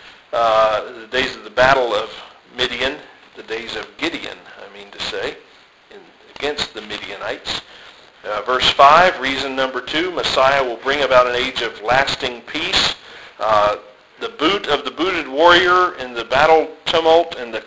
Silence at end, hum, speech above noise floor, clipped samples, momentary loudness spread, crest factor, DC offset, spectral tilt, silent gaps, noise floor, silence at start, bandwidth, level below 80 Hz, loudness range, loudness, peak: 0 s; none; 30 dB; under 0.1%; 16 LU; 18 dB; under 0.1%; -3 dB/octave; none; -47 dBFS; 0.05 s; 8 kHz; -48 dBFS; 12 LU; -17 LUFS; 0 dBFS